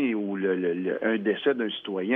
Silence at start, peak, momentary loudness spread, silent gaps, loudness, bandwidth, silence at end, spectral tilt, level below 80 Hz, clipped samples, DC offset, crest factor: 0 s; -12 dBFS; 4 LU; none; -27 LUFS; 3.9 kHz; 0 s; -9 dB/octave; -78 dBFS; under 0.1%; under 0.1%; 16 dB